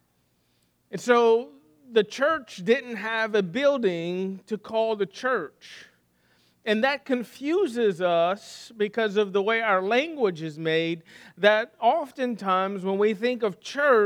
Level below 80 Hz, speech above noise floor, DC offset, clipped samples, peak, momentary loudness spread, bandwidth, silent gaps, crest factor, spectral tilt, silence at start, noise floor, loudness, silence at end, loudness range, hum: -78 dBFS; 44 dB; under 0.1%; under 0.1%; -4 dBFS; 10 LU; 14 kHz; none; 22 dB; -5 dB/octave; 0.9 s; -68 dBFS; -25 LUFS; 0 s; 4 LU; none